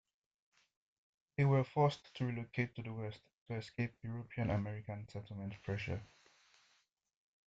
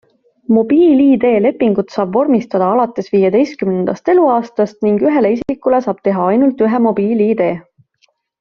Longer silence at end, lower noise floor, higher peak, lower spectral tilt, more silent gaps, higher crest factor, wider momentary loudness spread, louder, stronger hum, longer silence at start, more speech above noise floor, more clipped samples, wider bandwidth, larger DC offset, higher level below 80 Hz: first, 1.4 s vs 0.8 s; first, -76 dBFS vs -60 dBFS; second, -20 dBFS vs -2 dBFS; about the same, -8 dB/octave vs -7 dB/octave; first, 3.33-3.46 s vs none; first, 20 dB vs 12 dB; first, 14 LU vs 7 LU; second, -40 LUFS vs -13 LUFS; neither; first, 1.4 s vs 0.5 s; second, 38 dB vs 47 dB; neither; first, 7.8 kHz vs 6.8 kHz; neither; second, -68 dBFS vs -54 dBFS